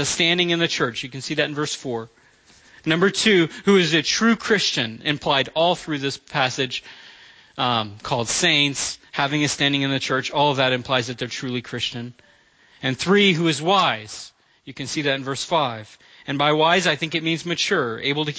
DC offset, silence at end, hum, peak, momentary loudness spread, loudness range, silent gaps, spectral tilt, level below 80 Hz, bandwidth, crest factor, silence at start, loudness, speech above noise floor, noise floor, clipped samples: under 0.1%; 0 s; none; -4 dBFS; 12 LU; 4 LU; none; -3.5 dB/octave; -58 dBFS; 8 kHz; 18 dB; 0 s; -21 LUFS; 34 dB; -55 dBFS; under 0.1%